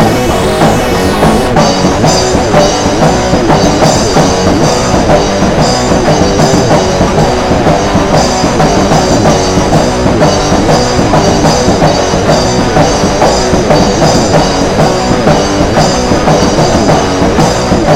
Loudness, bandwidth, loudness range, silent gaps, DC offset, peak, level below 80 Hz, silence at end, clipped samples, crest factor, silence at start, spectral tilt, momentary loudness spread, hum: -8 LUFS; 16.5 kHz; 0 LU; none; 0.7%; 0 dBFS; -20 dBFS; 0 s; 1%; 8 dB; 0 s; -5 dB/octave; 2 LU; none